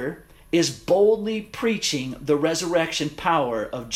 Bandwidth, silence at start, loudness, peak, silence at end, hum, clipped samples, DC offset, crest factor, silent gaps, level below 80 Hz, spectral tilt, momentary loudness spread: 16 kHz; 0 s; -23 LUFS; -8 dBFS; 0 s; none; under 0.1%; under 0.1%; 16 dB; none; -52 dBFS; -4 dB/octave; 9 LU